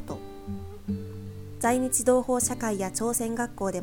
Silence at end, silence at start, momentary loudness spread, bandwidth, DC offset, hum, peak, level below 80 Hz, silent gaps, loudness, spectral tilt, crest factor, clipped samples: 0 s; 0 s; 16 LU; 18 kHz; under 0.1%; none; -8 dBFS; -50 dBFS; none; -27 LUFS; -4.5 dB/octave; 20 dB; under 0.1%